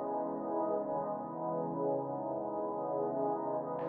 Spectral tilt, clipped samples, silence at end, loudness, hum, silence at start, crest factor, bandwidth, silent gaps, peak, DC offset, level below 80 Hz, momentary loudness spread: -5.5 dB/octave; under 0.1%; 0 s; -36 LUFS; none; 0 s; 14 dB; 2.6 kHz; none; -22 dBFS; under 0.1%; -78 dBFS; 3 LU